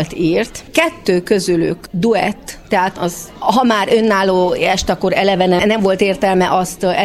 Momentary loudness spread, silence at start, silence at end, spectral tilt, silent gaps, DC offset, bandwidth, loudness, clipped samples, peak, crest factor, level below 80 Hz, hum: 6 LU; 0 s; 0 s; -5 dB/octave; none; under 0.1%; 15.5 kHz; -15 LUFS; under 0.1%; 0 dBFS; 14 dB; -40 dBFS; none